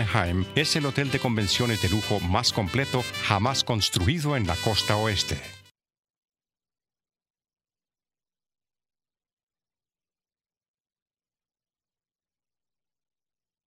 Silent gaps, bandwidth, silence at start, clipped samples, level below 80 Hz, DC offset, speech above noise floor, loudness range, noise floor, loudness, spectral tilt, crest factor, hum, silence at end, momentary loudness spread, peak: none; 16 kHz; 0 s; under 0.1%; -48 dBFS; under 0.1%; over 65 dB; 7 LU; under -90 dBFS; -25 LUFS; -4 dB/octave; 26 dB; none; 8.1 s; 3 LU; -2 dBFS